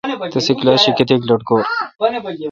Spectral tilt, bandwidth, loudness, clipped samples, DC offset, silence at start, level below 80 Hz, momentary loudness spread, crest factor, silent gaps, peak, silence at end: -5 dB/octave; 7.6 kHz; -15 LUFS; under 0.1%; under 0.1%; 0.05 s; -56 dBFS; 8 LU; 16 dB; none; 0 dBFS; 0 s